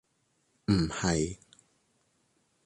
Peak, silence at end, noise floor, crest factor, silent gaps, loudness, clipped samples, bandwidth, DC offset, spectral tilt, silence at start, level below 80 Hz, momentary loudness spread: -14 dBFS; 1.3 s; -74 dBFS; 20 dB; none; -30 LUFS; under 0.1%; 11.5 kHz; under 0.1%; -5 dB/octave; 0.7 s; -50 dBFS; 12 LU